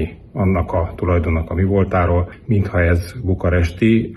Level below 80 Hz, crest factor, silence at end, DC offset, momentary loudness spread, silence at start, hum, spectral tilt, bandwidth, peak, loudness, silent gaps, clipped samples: -28 dBFS; 14 dB; 0 s; under 0.1%; 5 LU; 0 s; none; -8.5 dB/octave; 12 kHz; -4 dBFS; -18 LUFS; none; under 0.1%